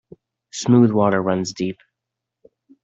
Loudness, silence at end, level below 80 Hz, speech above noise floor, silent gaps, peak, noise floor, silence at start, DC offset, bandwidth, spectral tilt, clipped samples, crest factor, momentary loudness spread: -19 LUFS; 1.1 s; -62 dBFS; 66 dB; none; -4 dBFS; -83 dBFS; 0.55 s; under 0.1%; 8 kHz; -6.5 dB/octave; under 0.1%; 18 dB; 16 LU